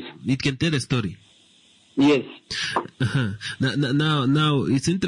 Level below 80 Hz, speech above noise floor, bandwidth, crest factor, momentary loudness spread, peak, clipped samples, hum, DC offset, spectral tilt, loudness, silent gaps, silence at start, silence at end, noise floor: -54 dBFS; 34 dB; 11 kHz; 12 dB; 8 LU; -10 dBFS; under 0.1%; none; under 0.1%; -5.5 dB/octave; -23 LUFS; none; 0 s; 0 s; -56 dBFS